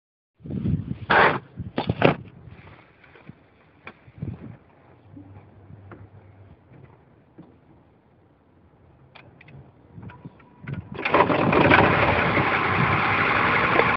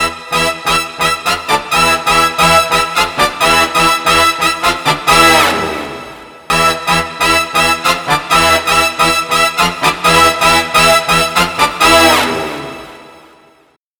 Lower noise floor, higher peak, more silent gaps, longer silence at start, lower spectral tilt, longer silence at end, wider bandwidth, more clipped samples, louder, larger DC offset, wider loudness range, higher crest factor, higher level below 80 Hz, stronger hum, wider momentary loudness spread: first, -58 dBFS vs -51 dBFS; about the same, 0 dBFS vs 0 dBFS; neither; first, 0.45 s vs 0 s; first, -8.5 dB/octave vs -2 dB/octave; second, 0 s vs 0.9 s; second, 6 kHz vs 19.5 kHz; neither; second, -20 LUFS vs -10 LUFS; neither; first, 24 LU vs 2 LU; first, 24 dB vs 12 dB; second, -48 dBFS vs -36 dBFS; neither; first, 24 LU vs 8 LU